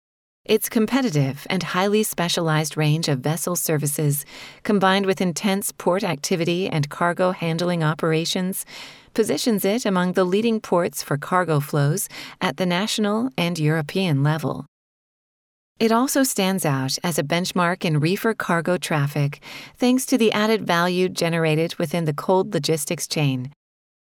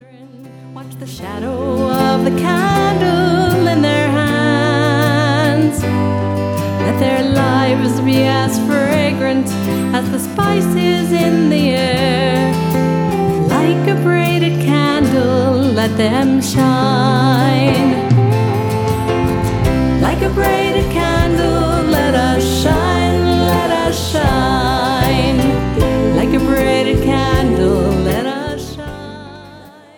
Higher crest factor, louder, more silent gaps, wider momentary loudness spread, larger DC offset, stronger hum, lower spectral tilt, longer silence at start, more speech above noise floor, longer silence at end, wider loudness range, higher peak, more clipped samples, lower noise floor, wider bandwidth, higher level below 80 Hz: first, 18 dB vs 12 dB; second, -22 LUFS vs -14 LUFS; first, 14.68-15.75 s vs none; about the same, 6 LU vs 5 LU; neither; neither; about the same, -5 dB/octave vs -6 dB/octave; first, 0.5 s vs 0.2 s; first, over 69 dB vs 25 dB; first, 0.6 s vs 0.3 s; about the same, 2 LU vs 2 LU; second, -4 dBFS vs 0 dBFS; neither; first, under -90 dBFS vs -38 dBFS; about the same, 19 kHz vs 18 kHz; second, -62 dBFS vs -28 dBFS